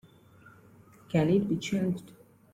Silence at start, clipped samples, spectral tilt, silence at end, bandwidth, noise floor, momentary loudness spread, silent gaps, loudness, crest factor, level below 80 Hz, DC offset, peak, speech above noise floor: 1.1 s; under 0.1%; -7 dB/octave; 0.45 s; 15 kHz; -56 dBFS; 7 LU; none; -29 LUFS; 18 dB; -62 dBFS; under 0.1%; -14 dBFS; 29 dB